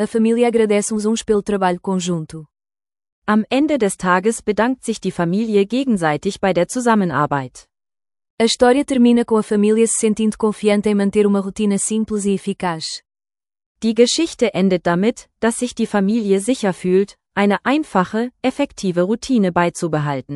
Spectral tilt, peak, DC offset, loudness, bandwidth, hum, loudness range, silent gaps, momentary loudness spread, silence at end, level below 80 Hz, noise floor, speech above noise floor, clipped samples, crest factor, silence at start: -5 dB/octave; 0 dBFS; under 0.1%; -18 LUFS; 12 kHz; none; 3 LU; 3.12-3.22 s, 8.30-8.38 s, 13.66-13.75 s; 7 LU; 0 s; -52 dBFS; under -90 dBFS; over 73 dB; under 0.1%; 16 dB; 0 s